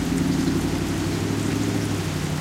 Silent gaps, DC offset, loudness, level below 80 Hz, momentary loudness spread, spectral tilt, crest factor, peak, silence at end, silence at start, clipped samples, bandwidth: none; under 0.1%; -24 LUFS; -38 dBFS; 3 LU; -5.5 dB/octave; 14 dB; -10 dBFS; 0 s; 0 s; under 0.1%; 16 kHz